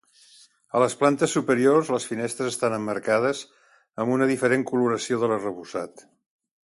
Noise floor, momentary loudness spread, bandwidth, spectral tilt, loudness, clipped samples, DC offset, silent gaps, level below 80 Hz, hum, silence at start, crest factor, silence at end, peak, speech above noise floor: -55 dBFS; 12 LU; 11.5 kHz; -5 dB/octave; -24 LUFS; under 0.1%; under 0.1%; none; -68 dBFS; none; 0.75 s; 18 dB; 0.7 s; -6 dBFS; 32 dB